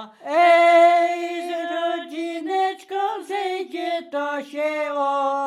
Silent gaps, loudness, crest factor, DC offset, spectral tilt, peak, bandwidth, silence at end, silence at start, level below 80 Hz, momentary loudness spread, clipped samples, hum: none; -21 LUFS; 16 dB; under 0.1%; -2 dB/octave; -6 dBFS; 12 kHz; 0 s; 0 s; under -90 dBFS; 13 LU; under 0.1%; none